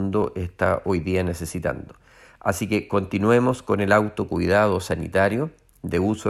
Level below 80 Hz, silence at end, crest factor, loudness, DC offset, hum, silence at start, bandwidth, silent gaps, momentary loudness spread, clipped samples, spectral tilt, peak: -46 dBFS; 0 s; 18 dB; -23 LUFS; under 0.1%; none; 0 s; 14.5 kHz; none; 9 LU; under 0.1%; -6.5 dB/octave; -4 dBFS